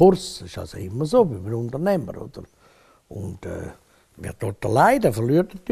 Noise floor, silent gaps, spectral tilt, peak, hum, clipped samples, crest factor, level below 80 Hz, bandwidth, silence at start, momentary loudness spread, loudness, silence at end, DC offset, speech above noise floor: -55 dBFS; none; -6.5 dB/octave; -4 dBFS; none; under 0.1%; 18 dB; -48 dBFS; 14.5 kHz; 0 s; 20 LU; -22 LUFS; 0 s; under 0.1%; 34 dB